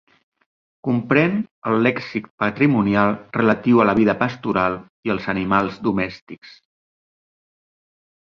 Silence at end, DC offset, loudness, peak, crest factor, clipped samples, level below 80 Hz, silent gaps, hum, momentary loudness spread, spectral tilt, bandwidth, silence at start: 1.85 s; under 0.1%; -20 LUFS; -2 dBFS; 18 dB; under 0.1%; -52 dBFS; 1.51-1.62 s, 2.30-2.38 s, 4.90-5.03 s, 6.21-6.27 s; none; 12 LU; -8.5 dB/octave; 6.6 kHz; 0.85 s